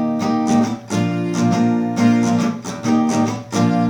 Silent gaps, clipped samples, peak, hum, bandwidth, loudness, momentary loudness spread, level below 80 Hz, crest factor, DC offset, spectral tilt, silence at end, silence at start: none; under 0.1%; -4 dBFS; none; 11.5 kHz; -18 LUFS; 5 LU; -60 dBFS; 14 dB; under 0.1%; -6 dB/octave; 0 s; 0 s